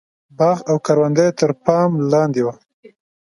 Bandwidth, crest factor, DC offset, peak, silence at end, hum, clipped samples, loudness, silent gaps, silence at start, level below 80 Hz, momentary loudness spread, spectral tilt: 11.5 kHz; 18 dB; under 0.1%; 0 dBFS; 0.75 s; none; under 0.1%; -17 LUFS; none; 0.4 s; -62 dBFS; 4 LU; -7 dB/octave